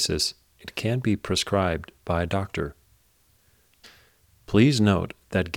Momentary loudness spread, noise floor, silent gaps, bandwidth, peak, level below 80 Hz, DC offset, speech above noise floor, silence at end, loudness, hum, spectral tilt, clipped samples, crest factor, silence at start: 13 LU; -63 dBFS; none; 18 kHz; -6 dBFS; -46 dBFS; under 0.1%; 39 dB; 0 s; -25 LUFS; none; -5 dB/octave; under 0.1%; 20 dB; 0 s